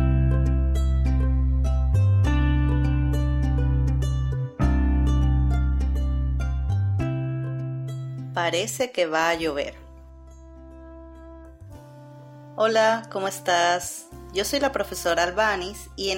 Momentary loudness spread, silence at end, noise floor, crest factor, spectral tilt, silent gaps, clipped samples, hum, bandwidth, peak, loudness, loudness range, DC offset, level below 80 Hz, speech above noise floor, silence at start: 13 LU; 0 s; -44 dBFS; 16 dB; -5.5 dB/octave; none; under 0.1%; none; 16.5 kHz; -8 dBFS; -24 LUFS; 6 LU; under 0.1%; -26 dBFS; 20 dB; 0 s